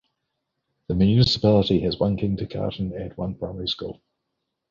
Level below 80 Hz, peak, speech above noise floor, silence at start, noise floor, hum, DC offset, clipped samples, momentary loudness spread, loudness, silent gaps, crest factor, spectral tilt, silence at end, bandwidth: -44 dBFS; -6 dBFS; 57 dB; 0.9 s; -79 dBFS; none; under 0.1%; under 0.1%; 13 LU; -23 LUFS; none; 18 dB; -7.5 dB/octave; 0.75 s; 7.4 kHz